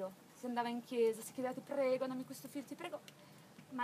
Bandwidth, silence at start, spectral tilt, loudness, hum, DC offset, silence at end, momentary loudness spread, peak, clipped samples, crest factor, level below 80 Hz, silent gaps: 15.5 kHz; 0 s; -4.5 dB/octave; -41 LUFS; none; under 0.1%; 0 s; 19 LU; -24 dBFS; under 0.1%; 16 dB; under -90 dBFS; none